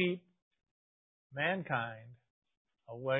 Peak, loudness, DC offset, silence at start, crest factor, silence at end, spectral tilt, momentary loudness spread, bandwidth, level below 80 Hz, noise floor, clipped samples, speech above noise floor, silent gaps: -18 dBFS; -37 LUFS; under 0.1%; 0 s; 22 dB; 0 s; -2 dB/octave; 16 LU; 3.8 kHz; -80 dBFS; under -90 dBFS; under 0.1%; over 54 dB; 0.42-0.51 s, 0.71-1.30 s, 2.30-2.42 s, 2.57-2.65 s